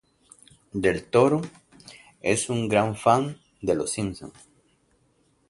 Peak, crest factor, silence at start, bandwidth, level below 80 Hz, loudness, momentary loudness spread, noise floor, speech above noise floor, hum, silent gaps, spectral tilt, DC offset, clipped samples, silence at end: -4 dBFS; 22 dB; 0.75 s; 11.5 kHz; -54 dBFS; -24 LUFS; 14 LU; -66 dBFS; 42 dB; none; none; -5 dB/octave; under 0.1%; under 0.1%; 1.2 s